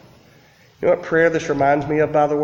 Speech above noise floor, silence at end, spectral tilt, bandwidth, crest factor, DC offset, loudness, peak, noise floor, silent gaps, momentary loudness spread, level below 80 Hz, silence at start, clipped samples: 34 dB; 0 s; -6.5 dB/octave; 7.6 kHz; 16 dB; under 0.1%; -18 LUFS; -4 dBFS; -51 dBFS; none; 3 LU; -50 dBFS; 0.8 s; under 0.1%